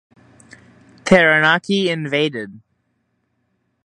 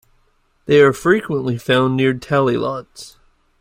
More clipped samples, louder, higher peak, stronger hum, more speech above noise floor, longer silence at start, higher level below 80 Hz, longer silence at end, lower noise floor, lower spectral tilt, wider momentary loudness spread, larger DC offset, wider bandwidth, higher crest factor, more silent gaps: neither; about the same, -15 LUFS vs -16 LUFS; about the same, 0 dBFS vs -2 dBFS; neither; first, 52 dB vs 43 dB; first, 1.05 s vs 0.7 s; about the same, -52 dBFS vs -52 dBFS; first, 1.3 s vs 0.55 s; first, -68 dBFS vs -60 dBFS; second, -5 dB/octave vs -6.5 dB/octave; about the same, 18 LU vs 19 LU; neither; second, 11 kHz vs 16 kHz; about the same, 20 dB vs 16 dB; neither